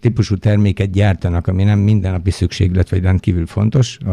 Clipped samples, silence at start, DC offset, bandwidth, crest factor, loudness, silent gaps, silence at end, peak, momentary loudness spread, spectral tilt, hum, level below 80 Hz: under 0.1%; 0.05 s; under 0.1%; 10 kHz; 12 dB; -16 LUFS; none; 0 s; -2 dBFS; 4 LU; -7.5 dB/octave; none; -32 dBFS